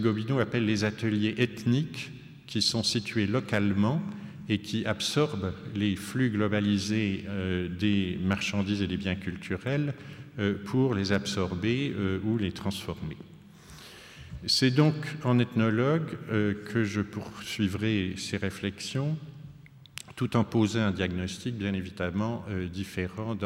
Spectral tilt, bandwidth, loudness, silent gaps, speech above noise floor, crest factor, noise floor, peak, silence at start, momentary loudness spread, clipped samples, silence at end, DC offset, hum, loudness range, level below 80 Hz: -5.5 dB/octave; 16 kHz; -29 LUFS; none; 22 dB; 18 dB; -50 dBFS; -10 dBFS; 0 s; 12 LU; under 0.1%; 0 s; under 0.1%; none; 4 LU; -62 dBFS